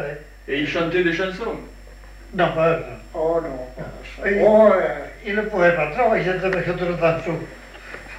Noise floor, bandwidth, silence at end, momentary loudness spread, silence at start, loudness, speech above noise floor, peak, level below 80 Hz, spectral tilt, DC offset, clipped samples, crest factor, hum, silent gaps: -41 dBFS; 10.5 kHz; 0 s; 19 LU; 0 s; -20 LUFS; 20 dB; -4 dBFS; -42 dBFS; -6.5 dB/octave; under 0.1%; under 0.1%; 18 dB; none; none